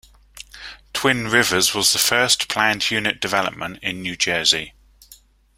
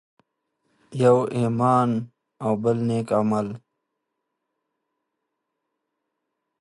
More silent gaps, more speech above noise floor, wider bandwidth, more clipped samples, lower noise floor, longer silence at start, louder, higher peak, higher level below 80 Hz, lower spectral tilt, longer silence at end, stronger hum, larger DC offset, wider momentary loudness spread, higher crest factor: neither; second, 30 dB vs 59 dB; first, 16 kHz vs 11.5 kHz; neither; second, -50 dBFS vs -80 dBFS; second, 0.35 s vs 0.9 s; first, -18 LUFS vs -22 LUFS; first, 0 dBFS vs -6 dBFS; first, -52 dBFS vs -64 dBFS; second, -1.5 dB/octave vs -8 dB/octave; second, 0.45 s vs 3.05 s; neither; neither; first, 18 LU vs 14 LU; about the same, 22 dB vs 20 dB